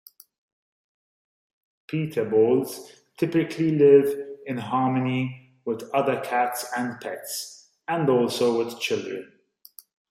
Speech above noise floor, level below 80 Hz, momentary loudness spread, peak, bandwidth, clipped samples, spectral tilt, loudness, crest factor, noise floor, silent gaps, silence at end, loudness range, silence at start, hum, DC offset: 29 dB; -72 dBFS; 15 LU; -6 dBFS; 16 kHz; under 0.1%; -5.5 dB/octave; -24 LUFS; 20 dB; -52 dBFS; none; 0.85 s; 5 LU; 1.9 s; none; under 0.1%